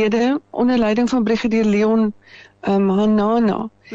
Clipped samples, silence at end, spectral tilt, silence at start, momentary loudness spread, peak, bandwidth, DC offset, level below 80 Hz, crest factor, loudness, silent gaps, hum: under 0.1%; 0 s; -7 dB/octave; 0 s; 5 LU; -8 dBFS; 7.6 kHz; under 0.1%; -48 dBFS; 8 dB; -18 LUFS; none; none